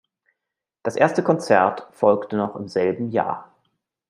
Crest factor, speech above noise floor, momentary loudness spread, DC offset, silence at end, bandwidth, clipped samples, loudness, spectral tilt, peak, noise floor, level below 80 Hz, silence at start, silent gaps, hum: 20 dB; 64 dB; 10 LU; under 0.1%; 0.65 s; 11.5 kHz; under 0.1%; -21 LUFS; -6.5 dB/octave; -2 dBFS; -85 dBFS; -70 dBFS; 0.85 s; none; none